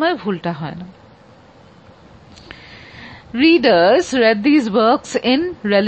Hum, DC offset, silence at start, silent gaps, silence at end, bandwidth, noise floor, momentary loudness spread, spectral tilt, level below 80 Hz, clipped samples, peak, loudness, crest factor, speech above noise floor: none; under 0.1%; 0 s; none; 0 s; 8.6 kHz; -45 dBFS; 25 LU; -5 dB/octave; -52 dBFS; under 0.1%; -2 dBFS; -15 LUFS; 16 dB; 30 dB